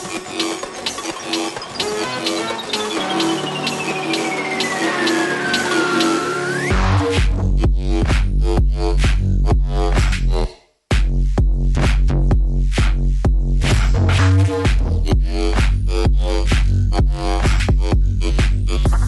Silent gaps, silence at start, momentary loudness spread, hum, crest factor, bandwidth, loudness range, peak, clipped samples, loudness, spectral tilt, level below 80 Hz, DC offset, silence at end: none; 0 s; 5 LU; none; 14 dB; 12 kHz; 3 LU; -4 dBFS; under 0.1%; -19 LUFS; -5 dB/octave; -18 dBFS; under 0.1%; 0 s